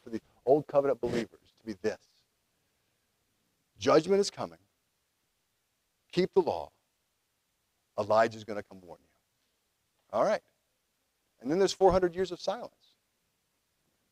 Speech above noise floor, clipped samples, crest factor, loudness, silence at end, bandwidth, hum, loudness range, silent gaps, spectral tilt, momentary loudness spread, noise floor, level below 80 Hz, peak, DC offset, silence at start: 49 dB; under 0.1%; 22 dB; -29 LUFS; 1.45 s; 12.5 kHz; none; 5 LU; none; -5.5 dB/octave; 17 LU; -78 dBFS; -60 dBFS; -10 dBFS; under 0.1%; 0.05 s